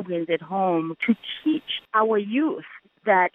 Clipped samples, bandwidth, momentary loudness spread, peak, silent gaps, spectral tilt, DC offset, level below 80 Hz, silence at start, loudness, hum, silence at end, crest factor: under 0.1%; 4 kHz; 6 LU; -6 dBFS; none; -8 dB/octave; under 0.1%; -74 dBFS; 0 s; -24 LUFS; none; 0.05 s; 16 dB